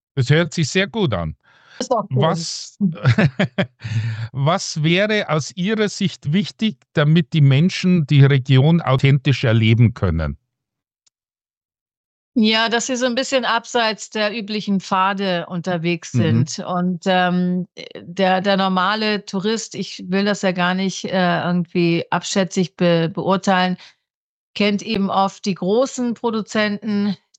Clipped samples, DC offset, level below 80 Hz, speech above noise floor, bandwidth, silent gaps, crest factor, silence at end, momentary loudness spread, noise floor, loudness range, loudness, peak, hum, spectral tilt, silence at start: under 0.1%; under 0.1%; -46 dBFS; over 72 dB; 8.6 kHz; 11.57-11.69 s, 11.81-11.86 s, 11.97-12.32 s, 24.14-24.54 s; 16 dB; 0.25 s; 9 LU; under -90 dBFS; 5 LU; -19 LUFS; -2 dBFS; none; -5.5 dB/octave; 0.15 s